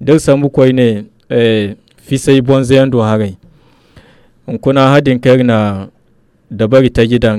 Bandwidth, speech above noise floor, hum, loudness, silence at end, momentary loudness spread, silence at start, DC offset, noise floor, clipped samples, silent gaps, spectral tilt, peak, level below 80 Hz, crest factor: 13.5 kHz; 41 dB; none; -11 LUFS; 0 s; 13 LU; 0 s; under 0.1%; -51 dBFS; under 0.1%; none; -7 dB/octave; 0 dBFS; -36 dBFS; 12 dB